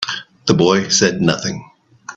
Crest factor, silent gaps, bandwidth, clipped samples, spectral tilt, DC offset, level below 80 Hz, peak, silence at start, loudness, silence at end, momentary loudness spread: 18 dB; none; 8.4 kHz; under 0.1%; -4 dB/octave; under 0.1%; -50 dBFS; 0 dBFS; 0 s; -16 LUFS; 0.05 s; 11 LU